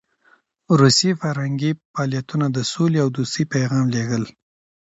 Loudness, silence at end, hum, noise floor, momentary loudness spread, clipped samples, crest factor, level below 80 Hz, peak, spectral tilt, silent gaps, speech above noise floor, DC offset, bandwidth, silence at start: -20 LUFS; 0.55 s; none; -59 dBFS; 10 LU; under 0.1%; 20 dB; -56 dBFS; -2 dBFS; -5 dB/octave; 1.85-1.94 s; 39 dB; under 0.1%; 8 kHz; 0.7 s